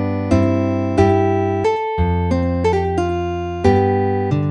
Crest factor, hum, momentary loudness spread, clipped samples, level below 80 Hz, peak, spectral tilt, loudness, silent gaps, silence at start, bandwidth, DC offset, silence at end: 16 dB; none; 5 LU; under 0.1%; -34 dBFS; -2 dBFS; -8 dB/octave; -17 LUFS; none; 0 s; 9 kHz; under 0.1%; 0 s